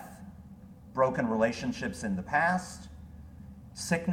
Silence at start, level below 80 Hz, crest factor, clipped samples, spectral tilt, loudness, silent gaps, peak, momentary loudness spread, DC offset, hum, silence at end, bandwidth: 0 s; -54 dBFS; 20 dB; under 0.1%; -5.5 dB/octave; -30 LUFS; none; -12 dBFS; 22 LU; under 0.1%; none; 0 s; 16.5 kHz